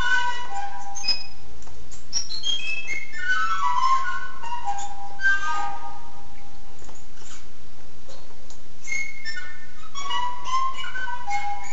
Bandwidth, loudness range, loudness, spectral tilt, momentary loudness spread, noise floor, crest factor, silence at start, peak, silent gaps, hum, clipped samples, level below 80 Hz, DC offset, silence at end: 8.2 kHz; 11 LU; -27 LUFS; -1 dB/octave; 24 LU; -48 dBFS; 18 dB; 0 s; -8 dBFS; none; none; under 0.1%; -52 dBFS; 10%; 0 s